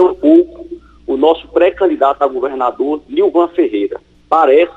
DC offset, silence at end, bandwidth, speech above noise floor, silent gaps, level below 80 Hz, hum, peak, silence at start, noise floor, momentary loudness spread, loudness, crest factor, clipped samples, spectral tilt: under 0.1%; 0.05 s; 4.5 kHz; 20 dB; none; -48 dBFS; none; 0 dBFS; 0 s; -32 dBFS; 12 LU; -13 LUFS; 12 dB; under 0.1%; -6.5 dB/octave